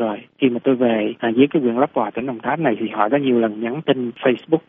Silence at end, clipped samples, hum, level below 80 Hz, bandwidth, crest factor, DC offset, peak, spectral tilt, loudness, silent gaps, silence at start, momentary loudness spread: 0.1 s; under 0.1%; none; -64 dBFS; 3.8 kHz; 18 dB; under 0.1%; -2 dBFS; -5 dB/octave; -19 LUFS; none; 0 s; 7 LU